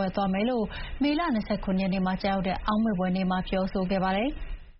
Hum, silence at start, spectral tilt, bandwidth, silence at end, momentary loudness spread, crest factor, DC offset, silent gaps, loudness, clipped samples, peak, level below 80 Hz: none; 0 s; -5.5 dB/octave; 5.8 kHz; 0.1 s; 3 LU; 14 dB; under 0.1%; none; -28 LUFS; under 0.1%; -14 dBFS; -40 dBFS